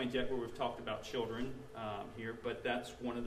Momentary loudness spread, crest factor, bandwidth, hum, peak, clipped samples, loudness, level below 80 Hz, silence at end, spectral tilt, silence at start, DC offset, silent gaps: 6 LU; 18 dB; 15 kHz; none; -22 dBFS; under 0.1%; -41 LUFS; -58 dBFS; 0 s; -5.5 dB/octave; 0 s; under 0.1%; none